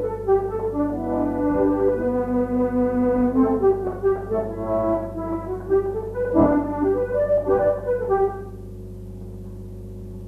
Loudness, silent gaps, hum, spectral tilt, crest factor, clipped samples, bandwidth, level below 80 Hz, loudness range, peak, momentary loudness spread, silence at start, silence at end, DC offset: -22 LUFS; none; 50 Hz at -35 dBFS; -10 dB/octave; 16 dB; under 0.1%; 3.4 kHz; -40 dBFS; 2 LU; -6 dBFS; 18 LU; 0 s; 0 s; under 0.1%